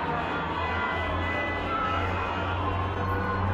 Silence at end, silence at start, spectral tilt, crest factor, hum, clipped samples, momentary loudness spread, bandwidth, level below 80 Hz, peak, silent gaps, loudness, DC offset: 0 s; 0 s; -7 dB/octave; 12 dB; none; under 0.1%; 2 LU; 7.6 kHz; -42 dBFS; -16 dBFS; none; -28 LUFS; under 0.1%